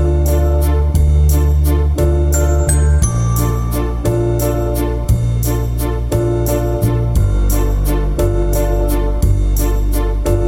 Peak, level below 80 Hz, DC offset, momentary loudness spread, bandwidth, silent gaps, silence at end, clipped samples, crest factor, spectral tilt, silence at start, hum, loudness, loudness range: -2 dBFS; -16 dBFS; under 0.1%; 5 LU; 16.5 kHz; none; 0 s; under 0.1%; 12 dB; -6.5 dB/octave; 0 s; none; -16 LUFS; 3 LU